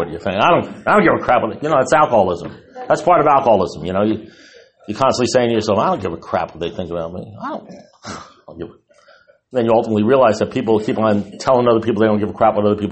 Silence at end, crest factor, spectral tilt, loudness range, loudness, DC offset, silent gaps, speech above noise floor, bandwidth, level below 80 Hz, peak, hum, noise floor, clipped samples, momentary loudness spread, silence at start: 0 s; 14 dB; -6 dB/octave; 9 LU; -16 LUFS; under 0.1%; none; 34 dB; 8.8 kHz; -50 dBFS; -2 dBFS; none; -50 dBFS; under 0.1%; 18 LU; 0 s